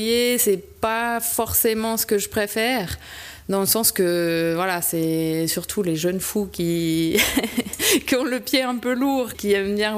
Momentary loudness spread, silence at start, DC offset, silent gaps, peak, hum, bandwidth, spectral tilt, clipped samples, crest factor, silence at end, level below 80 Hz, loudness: 6 LU; 0 s; under 0.1%; none; -6 dBFS; none; 15.5 kHz; -3.5 dB/octave; under 0.1%; 16 dB; 0 s; -48 dBFS; -21 LUFS